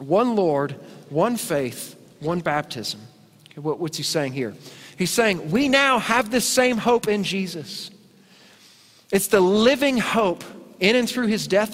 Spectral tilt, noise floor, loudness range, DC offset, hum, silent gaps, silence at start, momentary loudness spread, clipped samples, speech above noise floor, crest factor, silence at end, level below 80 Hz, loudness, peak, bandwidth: -4 dB/octave; -52 dBFS; 6 LU; under 0.1%; none; none; 0 s; 16 LU; under 0.1%; 31 dB; 20 dB; 0 s; -58 dBFS; -21 LUFS; -2 dBFS; 16 kHz